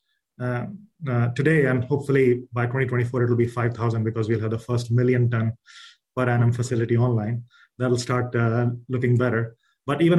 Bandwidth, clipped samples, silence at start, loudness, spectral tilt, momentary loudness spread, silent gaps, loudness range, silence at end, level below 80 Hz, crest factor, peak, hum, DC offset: 11 kHz; under 0.1%; 0.4 s; -23 LUFS; -7.5 dB/octave; 10 LU; none; 2 LU; 0 s; -58 dBFS; 16 dB; -6 dBFS; none; under 0.1%